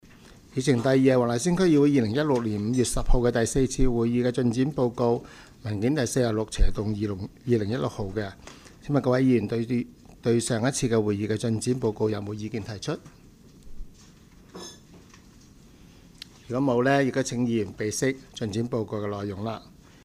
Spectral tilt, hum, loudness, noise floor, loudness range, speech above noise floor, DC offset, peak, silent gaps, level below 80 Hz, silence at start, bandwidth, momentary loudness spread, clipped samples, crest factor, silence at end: -6 dB/octave; none; -26 LUFS; -52 dBFS; 9 LU; 27 dB; under 0.1%; -8 dBFS; none; -36 dBFS; 0.55 s; 15 kHz; 13 LU; under 0.1%; 18 dB; 0.45 s